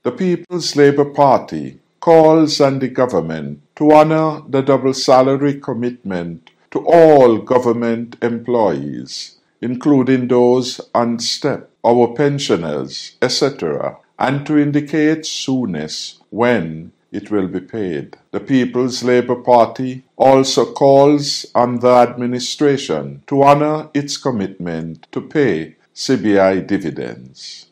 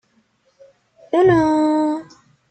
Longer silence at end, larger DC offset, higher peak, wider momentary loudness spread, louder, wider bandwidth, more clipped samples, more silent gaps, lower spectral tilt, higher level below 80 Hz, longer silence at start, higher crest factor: second, 0.1 s vs 0.45 s; neither; first, 0 dBFS vs -4 dBFS; first, 16 LU vs 9 LU; about the same, -15 LUFS vs -17 LUFS; first, 13.5 kHz vs 8.8 kHz; first, 0.1% vs under 0.1%; neither; second, -5.5 dB/octave vs -7.5 dB/octave; second, -58 dBFS vs -52 dBFS; second, 0.05 s vs 1.15 s; about the same, 14 dB vs 14 dB